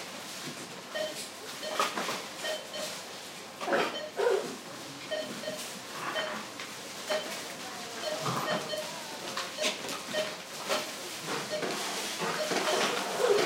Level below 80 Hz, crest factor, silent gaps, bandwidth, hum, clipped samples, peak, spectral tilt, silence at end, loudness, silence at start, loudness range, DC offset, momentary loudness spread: -80 dBFS; 20 dB; none; 16 kHz; none; under 0.1%; -14 dBFS; -2 dB/octave; 0 s; -34 LUFS; 0 s; 3 LU; under 0.1%; 10 LU